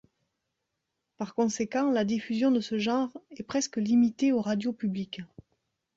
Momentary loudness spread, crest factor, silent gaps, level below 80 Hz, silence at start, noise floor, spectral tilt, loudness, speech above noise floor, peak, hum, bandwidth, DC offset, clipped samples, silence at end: 13 LU; 16 dB; none; -70 dBFS; 1.2 s; -83 dBFS; -5 dB/octave; -28 LUFS; 55 dB; -14 dBFS; none; 7.8 kHz; under 0.1%; under 0.1%; 0.7 s